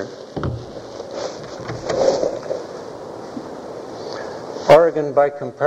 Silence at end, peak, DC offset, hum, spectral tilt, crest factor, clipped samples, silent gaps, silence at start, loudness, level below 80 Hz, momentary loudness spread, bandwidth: 0 s; 0 dBFS; under 0.1%; none; -5.5 dB/octave; 20 dB; under 0.1%; none; 0 s; -20 LUFS; -50 dBFS; 20 LU; 10.5 kHz